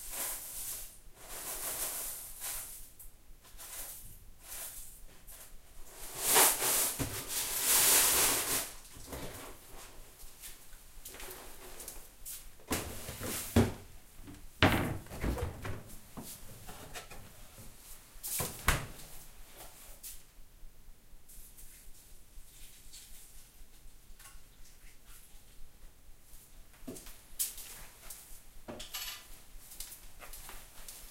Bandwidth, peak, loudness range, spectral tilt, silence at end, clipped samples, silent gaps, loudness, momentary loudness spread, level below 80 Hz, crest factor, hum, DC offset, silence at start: 16 kHz; -8 dBFS; 26 LU; -2 dB/octave; 0 s; under 0.1%; none; -32 LUFS; 26 LU; -50 dBFS; 30 dB; none; under 0.1%; 0 s